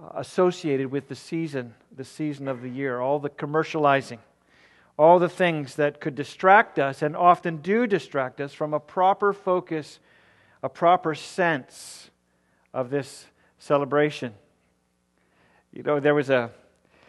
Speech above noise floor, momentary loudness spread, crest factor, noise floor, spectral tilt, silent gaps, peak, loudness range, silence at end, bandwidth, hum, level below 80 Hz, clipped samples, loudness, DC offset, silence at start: 45 dB; 17 LU; 22 dB; -69 dBFS; -6 dB/octave; none; -2 dBFS; 8 LU; 0.55 s; 12 kHz; none; -74 dBFS; under 0.1%; -24 LUFS; under 0.1%; 0 s